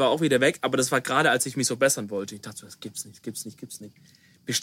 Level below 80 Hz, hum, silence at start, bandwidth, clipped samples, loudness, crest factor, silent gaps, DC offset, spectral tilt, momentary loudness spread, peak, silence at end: -70 dBFS; none; 0 s; 16.5 kHz; under 0.1%; -24 LUFS; 20 dB; none; under 0.1%; -3 dB/octave; 19 LU; -8 dBFS; 0 s